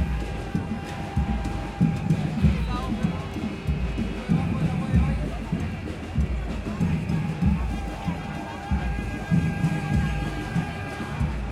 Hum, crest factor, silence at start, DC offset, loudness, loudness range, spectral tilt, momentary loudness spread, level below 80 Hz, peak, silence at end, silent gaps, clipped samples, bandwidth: none; 18 dB; 0 s; under 0.1%; -27 LUFS; 2 LU; -7.5 dB/octave; 8 LU; -32 dBFS; -8 dBFS; 0 s; none; under 0.1%; 12.5 kHz